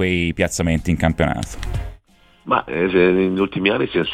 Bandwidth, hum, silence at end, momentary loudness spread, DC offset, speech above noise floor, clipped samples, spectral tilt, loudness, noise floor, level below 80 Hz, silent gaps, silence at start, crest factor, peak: 15.5 kHz; none; 0 s; 13 LU; under 0.1%; 34 dB; under 0.1%; -5.5 dB/octave; -19 LUFS; -53 dBFS; -34 dBFS; none; 0 s; 18 dB; -2 dBFS